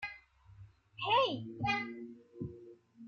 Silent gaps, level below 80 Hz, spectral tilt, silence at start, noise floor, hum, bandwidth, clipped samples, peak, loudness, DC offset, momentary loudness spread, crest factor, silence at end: none; -66 dBFS; -5.5 dB/octave; 0 s; -58 dBFS; none; 7.2 kHz; under 0.1%; -18 dBFS; -35 LUFS; under 0.1%; 24 LU; 20 dB; 0 s